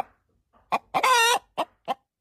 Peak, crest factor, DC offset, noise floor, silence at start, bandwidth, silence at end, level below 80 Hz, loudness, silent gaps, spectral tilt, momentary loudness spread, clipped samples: -10 dBFS; 16 dB; under 0.1%; -65 dBFS; 0.7 s; 15.5 kHz; 0.25 s; -68 dBFS; -24 LUFS; none; 0 dB/octave; 15 LU; under 0.1%